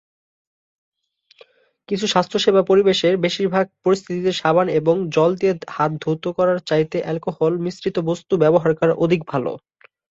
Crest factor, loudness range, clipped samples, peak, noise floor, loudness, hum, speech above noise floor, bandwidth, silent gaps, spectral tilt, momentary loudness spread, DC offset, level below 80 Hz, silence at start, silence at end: 18 dB; 3 LU; under 0.1%; -2 dBFS; -52 dBFS; -19 LUFS; none; 34 dB; 7.8 kHz; none; -6 dB/octave; 8 LU; under 0.1%; -60 dBFS; 1.9 s; 0.5 s